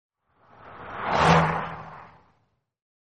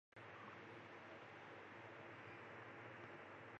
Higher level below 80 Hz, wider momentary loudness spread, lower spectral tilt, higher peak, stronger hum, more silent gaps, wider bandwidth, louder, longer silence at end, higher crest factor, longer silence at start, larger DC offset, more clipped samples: first, -50 dBFS vs -86 dBFS; first, 23 LU vs 1 LU; about the same, -5.5 dB/octave vs -5.5 dB/octave; first, -4 dBFS vs -44 dBFS; neither; neither; first, 9.4 kHz vs 8.2 kHz; first, -23 LUFS vs -57 LUFS; first, 1 s vs 0 s; first, 24 dB vs 14 dB; first, 0.65 s vs 0.15 s; neither; neither